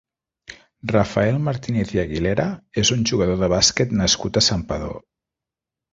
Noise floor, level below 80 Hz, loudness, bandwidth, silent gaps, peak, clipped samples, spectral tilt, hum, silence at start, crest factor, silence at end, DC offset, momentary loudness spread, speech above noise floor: -87 dBFS; -40 dBFS; -20 LUFS; 8.2 kHz; none; -2 dBFS; under 0.1%; -4 dB/octave; none; 0.5 s; 20 dB; 0.95 s; under 0.1%; 10 LU; 67 dB